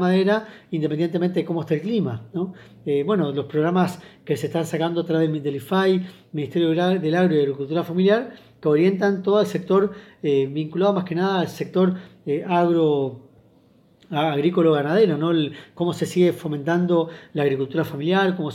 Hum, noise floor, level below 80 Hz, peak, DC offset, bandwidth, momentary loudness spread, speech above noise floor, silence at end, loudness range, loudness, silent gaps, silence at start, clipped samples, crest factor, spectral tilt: none; -56 dBFS; -68 dBFS; -6 dBFS; under 0.1%; 14.5 kHz; 9 LU; 35 dB; 0 s; 3 LU; -22 LUFS; none; 0 s; under 0.1%; 14 dB; -7.5 dB/octave